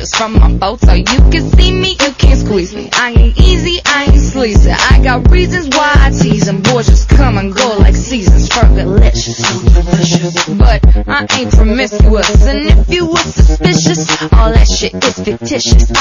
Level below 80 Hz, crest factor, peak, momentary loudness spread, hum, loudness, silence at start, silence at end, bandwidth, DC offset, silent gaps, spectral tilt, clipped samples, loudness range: -10 dBFS; 8 dB; 0 dBFS; 4 LU; none; -10 LUFS; 0 s; 0 s; 7.4 kHz; under 0.1%; none; -5 dB/octave; 2%; 1 LU